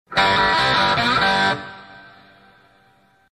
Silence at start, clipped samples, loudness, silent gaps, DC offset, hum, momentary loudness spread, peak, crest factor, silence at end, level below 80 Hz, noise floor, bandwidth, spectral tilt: 0.1 s; under 0.1%; -17 LUFS; none; under 0.1%; none; 8 LU; -4 dBFS; 16 dB; 1.3 s; -46 dBFS; -57 dBFS; 14 kHz; -3.5 dB/octave